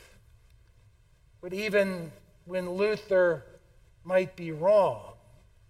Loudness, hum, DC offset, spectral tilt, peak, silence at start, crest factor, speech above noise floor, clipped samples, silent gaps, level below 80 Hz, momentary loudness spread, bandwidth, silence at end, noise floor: -28 LUFS; none; under 0.1%; -6 dB/octave; -12 dBFS; 1.45 s; 18 dB; 34 dB; under 0.1%; none; -60 dBFS; 15 LU; 14.5 kHz; 0.55 s; -60 dBFS